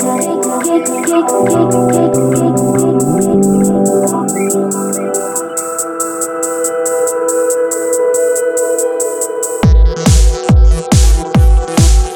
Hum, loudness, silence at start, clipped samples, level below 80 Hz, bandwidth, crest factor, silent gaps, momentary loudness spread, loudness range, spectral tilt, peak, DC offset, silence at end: none; -12 LUFS; 0 s; under 0.1%; -16 dBFS; 19.5 kHz; 10 dB; none; 6 LU; 4 LU; -5.5 dB/octave; 0 dBFS; under 0.1%; 0 s